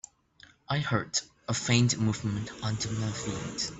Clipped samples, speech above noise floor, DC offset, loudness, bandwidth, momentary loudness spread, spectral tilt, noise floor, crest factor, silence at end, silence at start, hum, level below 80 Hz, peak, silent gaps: under 0.1%; 29 dB; under 0.1%; -30 LUFS; 8.4 kHz; 9 LU; -4 dB/octave; -59 dBFS; 20 dB; 0 s; 0.7 s; none; -58 dBFS; -10 dBFS; none